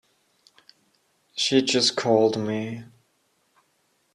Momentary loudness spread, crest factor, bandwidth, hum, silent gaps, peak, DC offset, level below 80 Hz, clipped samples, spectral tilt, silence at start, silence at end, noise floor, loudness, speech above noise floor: 16 LU; 20 dB; 12 kHz; none; none; -6 dBFS; under 0.1%; -68 dBFS; under 0.1%; -3.5 dB/octave; 1.35 s; 1.3 s; -69 dBFS; -22 LUFS; 46 dB